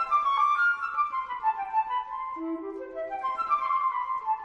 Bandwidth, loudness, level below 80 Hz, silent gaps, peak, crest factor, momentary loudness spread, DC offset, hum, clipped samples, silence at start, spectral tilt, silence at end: 8.4 kHz; -28 LUFS; -66 dBFS; none; -14 dBFS; 14 dB; 11 LU; under 0.1%; none; under 0.1%; 0 s; -3.5 dB/octave; 0 s